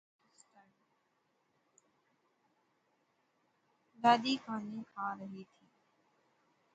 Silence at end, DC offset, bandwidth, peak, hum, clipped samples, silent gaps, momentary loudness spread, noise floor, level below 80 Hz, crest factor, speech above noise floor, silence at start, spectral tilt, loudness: 1.3 s; under 0.1%; 8.8 kHz; -16 dBFS; none; under 0.1%; none; 18 LU; -78 dBFS; -88 dBFS; 26 dB; 44 dB; 4 s; -4.5 dB/octave; -34 LUFS